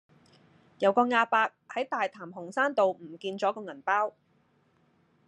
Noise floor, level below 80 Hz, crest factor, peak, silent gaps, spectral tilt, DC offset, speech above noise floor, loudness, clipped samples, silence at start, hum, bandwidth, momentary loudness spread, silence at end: -68 dBFS; -88 dBFS; 20 dB; -10 dBFS; none; -4.5 dB/octave; under 0.1%; 40 dB; -28 LUFS; under 0.1%; 0.8 s; none; 10 kHz; 12 LU; 1.2 s